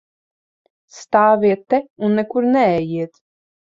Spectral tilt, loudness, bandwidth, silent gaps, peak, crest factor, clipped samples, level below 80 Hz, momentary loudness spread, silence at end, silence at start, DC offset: -7 dB/octave; -17 LUFS; 7.6 kHz; 1.90-1.96 s; -2 dBFS; 16 dB; under 0.1%; -60 dBFS; 10 LU; 0.7 s; 0.95 s; under 0.1%